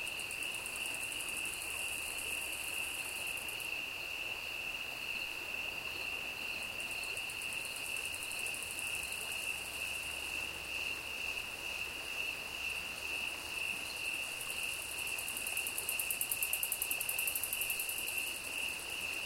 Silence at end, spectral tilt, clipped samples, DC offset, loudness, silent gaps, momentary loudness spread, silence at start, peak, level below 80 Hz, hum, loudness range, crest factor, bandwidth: 0 s; 0 dB/octave; under 0.1%; under 0.1%; -37 LUFS; none; 4 LU; 0 s; -12 dBFS; -64 dBFS; none; 4 LU; 28 dB; 17 kHz